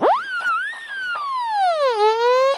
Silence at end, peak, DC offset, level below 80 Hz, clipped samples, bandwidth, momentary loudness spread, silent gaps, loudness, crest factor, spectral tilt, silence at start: 0 s; -8 dBFS; under 0.1%; -72 dBFS; under 0.1%; 12.5 kHz; 9 LU; none; -20 LUFS; 12 dB; -2 dB/octave; 0 s